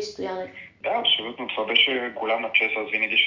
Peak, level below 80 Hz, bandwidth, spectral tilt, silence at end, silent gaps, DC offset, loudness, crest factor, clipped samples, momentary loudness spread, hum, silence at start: -6 dBFS; -66 dBFS; 7.6 kHz; -2.5 dB/octave; 0 s; none; under 0.1%; -22 LUFS; 20 dB; under 0.1%; 13 LU; none; 0 s